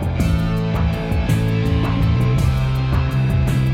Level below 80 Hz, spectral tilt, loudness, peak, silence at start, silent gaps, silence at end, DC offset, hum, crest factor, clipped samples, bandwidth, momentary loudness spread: -24 dBFS; -7.5 dB/octave; -19 LUFS; -6 dBFS; 0 s; none; 0 s; under 0.1%; none; 10 dB; under 0.1%; 15.5 kHz; 3 LU